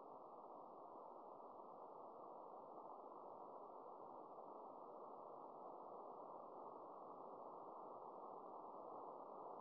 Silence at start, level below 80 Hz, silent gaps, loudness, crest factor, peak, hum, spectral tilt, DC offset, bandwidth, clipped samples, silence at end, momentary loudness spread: 0 s; under -90 dBFS; none; -58 LUFS; 14 dB; -42 dBFS; none; -5 dB/octave; under 0.1%; 3.2 kHz; under 0.1%; 0 s; 3 LU